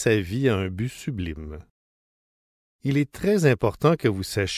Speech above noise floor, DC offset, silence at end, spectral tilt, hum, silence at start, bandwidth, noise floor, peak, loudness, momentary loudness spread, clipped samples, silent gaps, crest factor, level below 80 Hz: over 67 dB; under 0.1%; 0 s; -6 dB/octave; none; 0 s; 16 kHz; under -90 dBFS; -6 dBFS; -24 LUFS; 12 LU; under 0.1%; 1.70-2.79 s; 18 dB; -44 dBFS